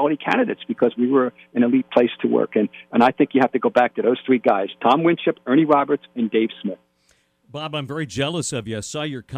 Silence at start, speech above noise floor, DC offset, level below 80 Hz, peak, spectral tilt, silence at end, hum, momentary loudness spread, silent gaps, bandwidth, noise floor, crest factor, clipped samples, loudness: 0 s; 43 dB; under 0.1%; -62 dBFS; -4 dBFS; -5.5 dB/octave; 0 s; none; 11 LU; none; 11 kHz; -63 dBFS; 16 dB; under 0.1%; -20 LUFS